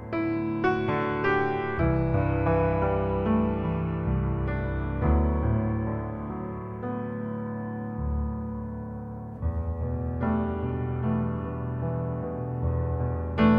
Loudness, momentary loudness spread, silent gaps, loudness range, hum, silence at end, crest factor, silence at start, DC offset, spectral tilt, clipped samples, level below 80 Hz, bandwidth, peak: -28 LUFS; 9 LU; none; 7 LU; none; 0 s; 18 dB; 0 s; under 0.1%; -10.5 dB/octave; under 0.1%; -36 dBFS; 5.6 kHz; -10 dBFS